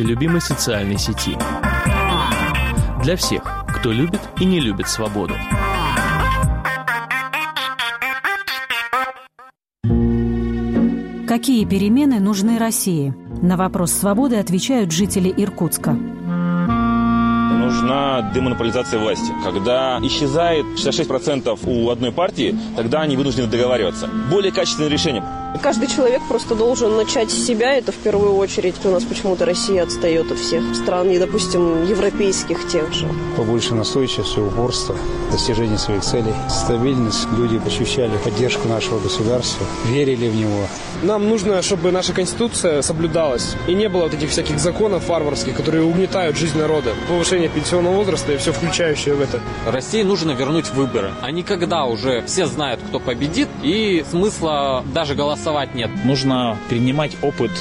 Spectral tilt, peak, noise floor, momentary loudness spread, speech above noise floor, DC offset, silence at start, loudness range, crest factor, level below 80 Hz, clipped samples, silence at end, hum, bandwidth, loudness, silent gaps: -5 dB/octave; -6 dBFS; -47 dBFS; 5 LU; 29 dB; under 0.1%; 0 s; 2 LU; 12 dB; -34 dBFS; under 0.1%; 0 s; none; 16 kHz; -18 LUFS; none